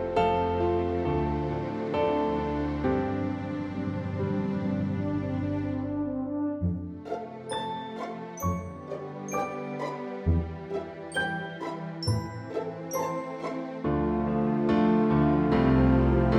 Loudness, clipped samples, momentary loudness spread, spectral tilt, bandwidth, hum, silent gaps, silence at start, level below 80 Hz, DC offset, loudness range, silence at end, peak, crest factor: -29 LUFS; under 0.1%; 12 LU; -7.5 dB/octave; 13 kHz; none; none; 0 s; -40 dBFS; under 0.1%; 7 LU; 0 s; -10 dBFS; 18 dB